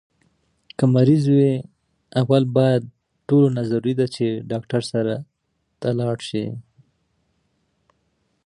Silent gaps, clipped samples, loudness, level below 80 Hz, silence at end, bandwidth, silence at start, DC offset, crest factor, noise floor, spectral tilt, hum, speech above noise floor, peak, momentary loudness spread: none; under 0.1%; -20 LUFS; -62 dBFS; 1.85 s; 10.5 kHz; 0.8 s; under 0.1%; 18 dB; -72 dBFS; -8 dB/octave; none; 53 dB; -4 dBFS; 13 LU